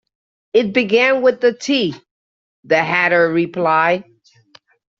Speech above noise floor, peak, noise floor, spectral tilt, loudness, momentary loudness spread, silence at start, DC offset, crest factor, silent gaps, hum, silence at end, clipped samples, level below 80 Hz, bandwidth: 36 dB; -2 dBFS; -51 dBFS; -2.5 dB/octave; -16 LUFS; 5 LU; 0.55 s; under 0.1%; 16 dB; 2.11-2.63 s; none; 0.95 s; under 0.1%; -62 dBFS; 7.6 kHz